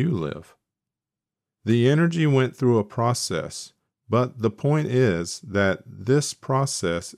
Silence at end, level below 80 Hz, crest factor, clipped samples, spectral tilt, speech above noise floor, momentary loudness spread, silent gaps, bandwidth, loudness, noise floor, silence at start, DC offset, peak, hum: 0.05 s; -58 dBFS; 16 dB; under 0.1%; -6 dB/octave; 66 dB; 11 LU; none; 14 kHz; -23 LUFS; -89 dBFS; 0 s; under 0.1%; -8 dBFS; none